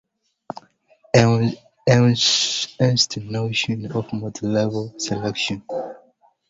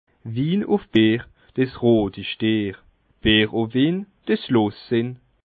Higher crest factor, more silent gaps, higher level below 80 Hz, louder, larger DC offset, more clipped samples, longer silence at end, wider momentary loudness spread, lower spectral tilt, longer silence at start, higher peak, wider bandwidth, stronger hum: about the same, 20 dB vs 18 dB; neither; second, -52 dBFS vs -46 dBFS; about the same, -20 LUFS vs -21 LUFS; neither; neither; first, 0.55 s vs 0.35 s; first, 14 LU vs 9 LU; second, -4.5 dB/octave vs -9 dB/octave; first, 0.55 s vs 0.25 s; about the same, -2 dBFS vs -4 dBFS; first, 7.8 kHz vs 4.8 kHz; neither